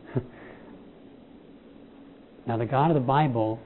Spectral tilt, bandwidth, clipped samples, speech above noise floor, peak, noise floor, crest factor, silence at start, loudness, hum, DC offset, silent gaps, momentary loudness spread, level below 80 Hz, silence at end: -11.5 dB/octave; 4.2 kHz; under 0.1%; 26 dB; -10 dBFS; -50 dBFS; 20 dB; 0 s; -25 LUFS; none; under 0.1%; none; 25 LU; -58 dBFS; 0 s